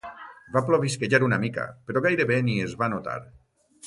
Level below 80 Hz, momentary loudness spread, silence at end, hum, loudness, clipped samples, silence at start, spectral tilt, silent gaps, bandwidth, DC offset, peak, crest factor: -60 dBFS; 13 LU; 0 s; none; -25 LUFS; under 0.1%; 0.05 s; -6 dB/octave; none; 11.5 kHz; under 0.1%; -6 dBFS; 20 dB